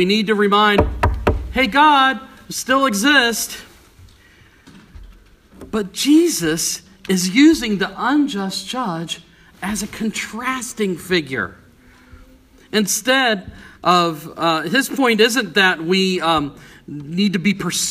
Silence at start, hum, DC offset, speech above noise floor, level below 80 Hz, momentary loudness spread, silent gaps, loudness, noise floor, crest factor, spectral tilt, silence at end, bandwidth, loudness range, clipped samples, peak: 0 s; none; under 0.1%; 32 dB; -36 dBFS; 13 LU; none; -17 LUFS; -49 dBFS; 18 dB; -3.5 dB/octave; 0 s; 15.5 kHz; 7 LU; under 0.1%; 0 dBFS